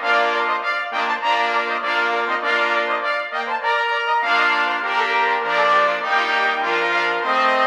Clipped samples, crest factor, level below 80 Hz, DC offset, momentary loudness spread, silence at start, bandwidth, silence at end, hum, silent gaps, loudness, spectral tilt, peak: under 0.1%; 14 dB; -76 dBFS; under 0.1%; 5 LU; 0 s; 13.5 kHz; 0 s; none; none; -19 LUFS; -2 dB/octave; -6 dBFS